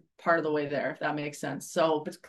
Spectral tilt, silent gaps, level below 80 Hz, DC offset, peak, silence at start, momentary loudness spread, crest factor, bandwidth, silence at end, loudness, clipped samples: -5 dB/octave; none; -76 dBFS; under 0.1%; -12 dBFS; 0.2 s; 7 LU; 18 dB; 12.5 kHz; 0 s; -30 LUFS; under 0.1%